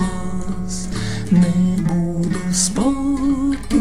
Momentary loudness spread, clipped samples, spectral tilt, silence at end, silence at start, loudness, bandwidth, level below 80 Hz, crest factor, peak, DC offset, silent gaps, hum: 9 LU; under 0.1%; -5.5 dB/octave; 0 s; 0 s; -19 LUFS; 13 kHz; -34 dBFS; 16 dB; -4 dBFS; 3%; none; none